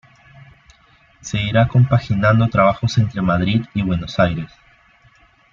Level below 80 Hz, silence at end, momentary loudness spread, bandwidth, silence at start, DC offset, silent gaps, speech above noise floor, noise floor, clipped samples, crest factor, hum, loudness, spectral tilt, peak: -42 dBFS; 1.05 s; 10 LU; 7.4 kHz; 1.25 s; under 0.1%; none; 36 dB; -53 dBFS; under 0.1%; 16 dB; none; -17 LUFS; -7 dB/octave; -2 dBFS